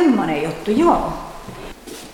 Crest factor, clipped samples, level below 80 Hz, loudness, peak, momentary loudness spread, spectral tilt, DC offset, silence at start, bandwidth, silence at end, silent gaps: 16 dB; under 0.1%; -40 dBFS; -18 LUFS; -2 dBFS; 19 LU; -6 dB/octave; under 0.1%; 0 s; 17 kHz; 0 s; none